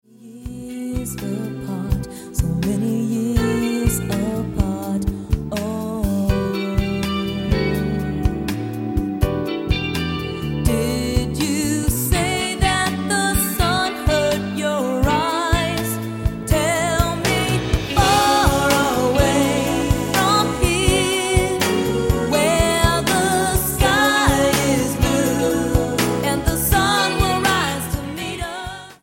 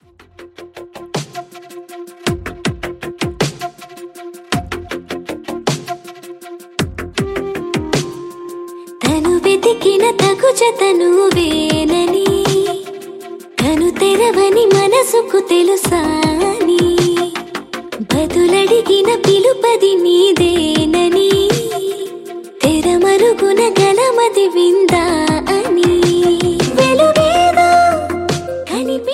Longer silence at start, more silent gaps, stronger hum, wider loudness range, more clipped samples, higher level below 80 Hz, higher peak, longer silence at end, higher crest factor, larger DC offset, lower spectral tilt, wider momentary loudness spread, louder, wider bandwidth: second, 0.2 s vs 0.4 s; neither; neither; second, 5 LU vs 11 LU; neither; first, -28 dBFS vs -40 dBFS; about the same, -2 dBFS vs 0 dBFS; about the same, 0.1 s vs 0 s; about the same, 18 dB vs 14 dB; neither; about the same, -4.5 dB/octave vs -4.5 dB/octave; second, 9 LU vs 18 LU; second, -19 LUFS vs -13 LUFS; about the same, 17 kHz vs 15.5 kHz